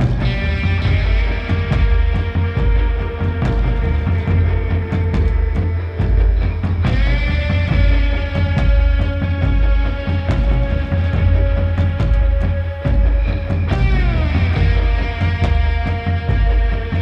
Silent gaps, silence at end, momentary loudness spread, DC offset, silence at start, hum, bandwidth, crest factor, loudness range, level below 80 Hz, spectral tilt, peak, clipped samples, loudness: none; 0 s; 4 LU; under 0.1%; 0 s; none; 5.8 kHz; 12 dB; 1 LU; -18 dBFS; -8.5 dB/octave; -4 dBFS; under 0.1%; -18 LUFS